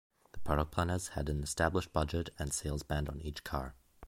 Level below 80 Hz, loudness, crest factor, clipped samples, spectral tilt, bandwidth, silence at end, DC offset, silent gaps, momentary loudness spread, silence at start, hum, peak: -44 dBFS; -36 LUFS; 20 dB; under 0.1%; -5 dB/octave; 16.5 kHz; 0 s; under 0.1%; none; 8 LU; 0.35 s; none; -16 dBFS